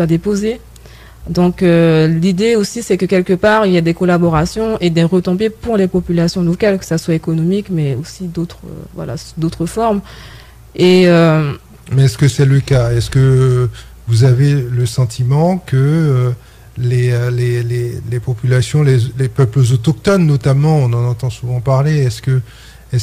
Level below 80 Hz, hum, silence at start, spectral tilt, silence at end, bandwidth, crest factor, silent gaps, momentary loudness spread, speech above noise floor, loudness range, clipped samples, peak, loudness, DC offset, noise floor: -36 dBFS; none; 0 s; -7 dB/octave; 0 s; 14.5 kHz; 12 dB; none; 10 LU; 24 dB; 5 LU; under 0.1%; -2 dBFS; -14 LUFS; under 0.1%; -37 dBFS